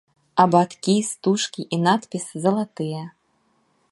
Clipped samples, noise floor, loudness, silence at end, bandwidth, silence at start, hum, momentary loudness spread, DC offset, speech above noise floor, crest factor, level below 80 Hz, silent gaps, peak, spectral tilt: under 0.1%; -66 dBFS; -22 LUFS; 0.85 s; 11.5 kHz; 0.35 s; none; 12 LU; under 0.1%; 45 dB; 22 dB; -68 dBFS; none; -2 dBFS; -5 dB/octave